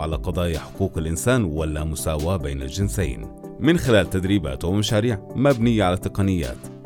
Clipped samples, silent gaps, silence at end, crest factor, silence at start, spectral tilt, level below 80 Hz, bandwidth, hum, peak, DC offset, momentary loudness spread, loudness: under 0.1%; none; 0 s; 18 dB; 0 s; -6 dB/octave; -34 dBFS; 17.5 kHz; none; -4 dBFS; under 0.1%; 8 LU; -22 LUFS